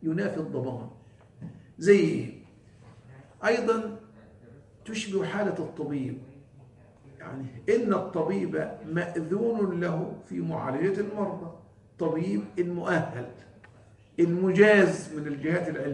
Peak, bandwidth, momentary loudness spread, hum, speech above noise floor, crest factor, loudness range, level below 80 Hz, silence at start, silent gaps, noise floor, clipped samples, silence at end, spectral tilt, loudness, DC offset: -6 dBFS; 10.5 kHz; 19 LU; none; 28 dB; 22 dB; 7 LU; -66 dBFS; 0 s; none; -55 dBFS; under 0.1%; 0 s; -6.5 dB/octave; -27 LUFS; under 0.1%